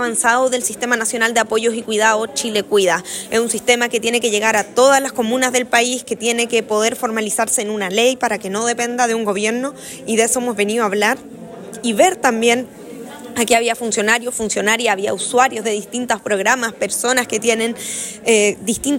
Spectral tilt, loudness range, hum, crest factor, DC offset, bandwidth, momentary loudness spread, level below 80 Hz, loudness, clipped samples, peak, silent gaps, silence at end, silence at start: -2 dB/octave; 2 LU; none; 16 dB; under 0.1%; 16.5 kHz; 7 LU; -58 dBFS; -17 LUFS; under 0.1%; 0 dBFS; none; 0 s; 0 s